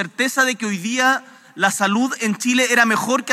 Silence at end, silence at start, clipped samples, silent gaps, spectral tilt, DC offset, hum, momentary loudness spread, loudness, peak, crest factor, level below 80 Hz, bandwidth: 0 s; 0 s; under 0.1%; none; -2.5 dB/octave; under 0.1%; none; 6 LU; -18 LUFS; 0 dBFS; 18 dB; -86 dBFS; 16 kHz